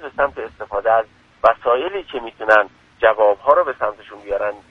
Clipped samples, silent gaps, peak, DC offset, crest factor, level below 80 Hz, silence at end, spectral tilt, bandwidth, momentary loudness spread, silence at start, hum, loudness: under 0.1%; none; 0 dBFS; under 0.1%; 18 dB; -50 dBFS; 0.15 s; -5 dB/octave; 6.6 kHz; 12 LU; 0 s; none; -18 LUFS